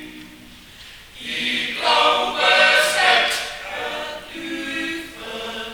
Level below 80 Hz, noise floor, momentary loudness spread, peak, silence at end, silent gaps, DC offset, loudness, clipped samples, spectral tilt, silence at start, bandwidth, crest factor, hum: -54 dBFS; -43 dBFS; 20 LU; -4 dBFS; 0 s; none; under 0.1%; -18 LUFS; under 0.1%; -1 dB/octave; 0 s; over 20 kHz; 18 dB; none